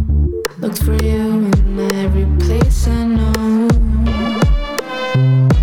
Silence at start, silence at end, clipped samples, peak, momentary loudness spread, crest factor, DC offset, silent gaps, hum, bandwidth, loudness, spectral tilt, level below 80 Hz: 0 s; 0 s; under 0.1%; -4 dBFS; 6 LU; 10 dB; 0.4%; none; none; 19 kHz; -15 LUFS; -7 dB/octave; -16 dBFS